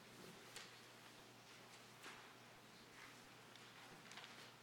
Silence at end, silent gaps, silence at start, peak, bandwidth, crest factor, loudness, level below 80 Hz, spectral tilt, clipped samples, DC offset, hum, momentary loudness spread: 0 s; none; 0 s; -38 dBFS; 18 kHz; 22 dB; -59 LUFS; -88 dBFS; -2.5 dB/octave; under 0.1%; under 0.1%; none; 5 LU